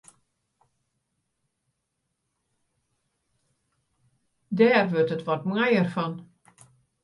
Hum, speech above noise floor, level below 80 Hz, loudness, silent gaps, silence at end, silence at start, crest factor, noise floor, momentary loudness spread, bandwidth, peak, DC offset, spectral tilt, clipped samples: none; 56 dB; -74 dBFS; -24 LUFS; none; 0.8 s; 4.5 s; 22 dB; -79 dBFS; 13 LU; 11.5 kHz; -8 dBFS; under 0.1%; -7.5 dB/octave; under 0.1%